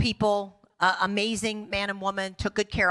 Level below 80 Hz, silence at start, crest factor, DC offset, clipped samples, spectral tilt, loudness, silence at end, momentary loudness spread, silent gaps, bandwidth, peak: -48 dBFS; 0 s; 18 dB; under 0.1%; under 0.1%; -4 dB/octave; -27 LUFS; 0 s; 6 LU; none; 12.5 kHz; -10 dBFS